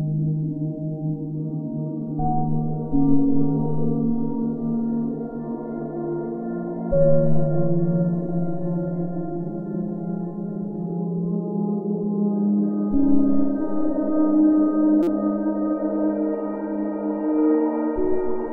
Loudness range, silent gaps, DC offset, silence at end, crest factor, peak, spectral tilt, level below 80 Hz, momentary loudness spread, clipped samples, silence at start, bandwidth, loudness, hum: 6 LU; none; under 0.1%; 0 s; 16 dB; -4 dBFS; -13 dB/octave; -42 dBFS; 9 LU; under 0.1%; 0 s; 2.5 kHz; -23 LUFS; none